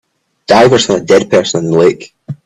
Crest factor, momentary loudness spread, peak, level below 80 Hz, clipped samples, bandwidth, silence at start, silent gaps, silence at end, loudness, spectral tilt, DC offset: 10 dB; 19 LU; 0 dBFS; -46 dBFS; under 0.1%; 12 kHz; 0.5 s; none; 0.1 s; -9 LUFS; -4.5 dB/octave; under 0.1%